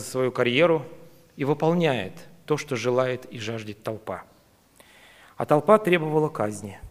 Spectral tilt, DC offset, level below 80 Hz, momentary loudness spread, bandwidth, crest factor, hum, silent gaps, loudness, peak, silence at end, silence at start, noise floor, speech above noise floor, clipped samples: -6 dB/octave; under 0.1%; -62 dBFS; 16 LU; 15.5 kHz; 22 dB; none; none; -24 LUFS; -2 dBFS; 0 s; 0 s; -57 dBFS; 33 dB; under 0.1%